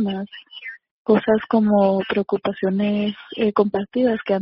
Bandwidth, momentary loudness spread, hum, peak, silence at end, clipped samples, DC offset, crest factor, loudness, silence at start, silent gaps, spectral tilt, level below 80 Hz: 5.6 kHz; 17 LU; none; -4 dBFS; 0 s; under 0.1%; under 0.1%; 16 dB; -20 LUFS; 0 s; 0.91-1.05 s; -5.5 dB/octave; -58 dBFS